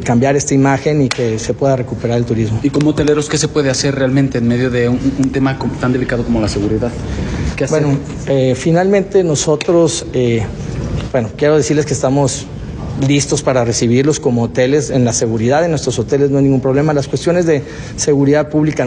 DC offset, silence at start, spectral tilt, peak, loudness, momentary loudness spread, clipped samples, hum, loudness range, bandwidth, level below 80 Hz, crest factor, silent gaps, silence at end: under 0.1%; 0 s; -5.5 dB/octave; 0 dBFS; -14 LUFS; 6 LU; under 0.1%; none; 2 LU; 10 kHz; -32 dBFS; 14 dB; none; 0 s